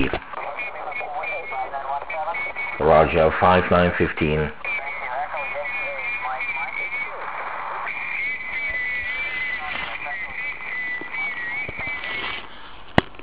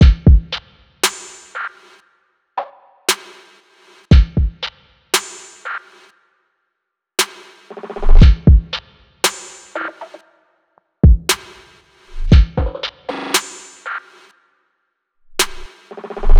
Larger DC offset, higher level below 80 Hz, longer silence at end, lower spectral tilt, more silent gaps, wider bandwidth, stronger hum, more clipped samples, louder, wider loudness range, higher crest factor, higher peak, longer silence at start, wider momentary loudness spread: first, 1% vs under 0.1%; second, -42 dBFS vs -18 dBFS; about the same, 0 s vs 0 s; first, -9 dB/octave vs -4.5 dB/octave; neither; second, 4 kHz vs 18 kHz; neither; neither; second, -24 LUFS vs -17 LUFS; about the same, 6 LU vs 7 LU; first, 24 dB vs 16 dB; about the same, 0 dBFS vs 0 dBFS; about the same, 0 s vs 0 s; second, 11 LU vs 20 LU